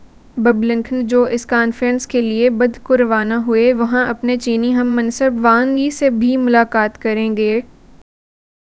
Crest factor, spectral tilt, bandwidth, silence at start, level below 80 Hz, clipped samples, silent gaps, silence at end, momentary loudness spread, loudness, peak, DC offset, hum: 16 dB; -5 dB/octave; 8 kHz; 0.35 s; -48 dBFS; under 0.1%; none; 0.95 s; 5 LU; -15 LUFS; 0 dBFS; 0.1%; none